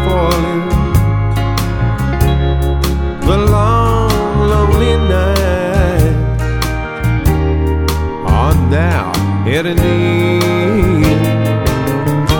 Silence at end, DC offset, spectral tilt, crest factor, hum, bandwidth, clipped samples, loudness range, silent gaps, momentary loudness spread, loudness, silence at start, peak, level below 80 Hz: 0 s; under 0.1%; -6.5 dB/octave; 12 dB; none; over 20 kHz; under 0.1%; 2 LU; none; 4 LU; -13 LUFS; 0 s; 0 dBFS; -18 dBFS